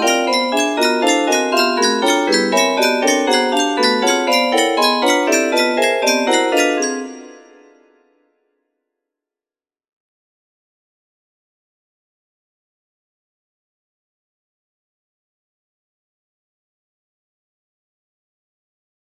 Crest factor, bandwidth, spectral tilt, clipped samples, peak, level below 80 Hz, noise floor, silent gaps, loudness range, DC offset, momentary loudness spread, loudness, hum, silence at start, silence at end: 18 dB; 15.5 kHz; -1.5 dB/octave; under 0.1%; 0 dBFS; -70 dBFS; under -90 dBFS; none; 7 LU; under 0.1%; 2 LU; -15 LUFS; none; 0 s; 11.65 s